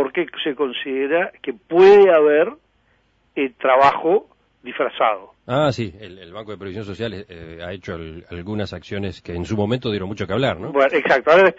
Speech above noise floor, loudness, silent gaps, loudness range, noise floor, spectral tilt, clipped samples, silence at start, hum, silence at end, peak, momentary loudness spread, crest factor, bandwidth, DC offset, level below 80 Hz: 43 dB; -18 LUFS; none; 13 LU; -61 dBFS; -6.5 dB/octave; under 0.1%; 0 s; none; 0.05 s; -2 dBFS; 20 LU; 18 dB; 7.8 kHz; under 0.1%; -52 dBFS